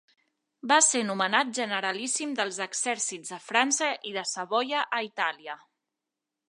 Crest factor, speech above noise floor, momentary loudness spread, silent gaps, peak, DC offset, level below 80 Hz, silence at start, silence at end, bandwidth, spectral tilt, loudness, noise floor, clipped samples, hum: 24 dB; 59 dB; 10 LU; none; -6 dBFS; under 0.1%; -86 dBFS; 0.65 s; 0.95 s; 11.5 kHz; -1 dB/octave; -26 LUFS; -87 dBFS; under 0.1%; none